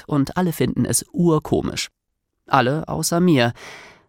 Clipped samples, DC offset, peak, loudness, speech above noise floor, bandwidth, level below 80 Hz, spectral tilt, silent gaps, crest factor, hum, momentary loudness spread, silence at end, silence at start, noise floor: under 0.1%; under 0.1%; -2 dBFS; -20 LUFS; 56 dB; 17.5 kHz; -46 dBFS; -5 dB/octave; none; 20 dB; none; 10 LU; 0.2 s; 0.1 s; -75 dBFS